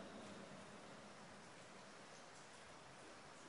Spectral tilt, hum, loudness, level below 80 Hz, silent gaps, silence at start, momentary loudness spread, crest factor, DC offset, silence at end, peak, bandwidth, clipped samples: -3.5 dB/octave; none; -58 LUFS; -84 dBFS; none; 0 s; 3 LU; 16 dB; under 0.1%; 0 s; -42 dBFS; 10.5 kHz; under 0.1%